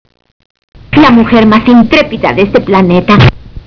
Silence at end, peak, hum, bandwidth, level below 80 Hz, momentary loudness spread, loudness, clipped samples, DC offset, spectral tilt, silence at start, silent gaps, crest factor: 0.1 s; 0 dBFS; none; 5.4 kHz; -28 dBFS; 5 LU; -6 LUFS; 6%; under 0.1%; -8 dB/octave; 0.95 s; none; 8 dB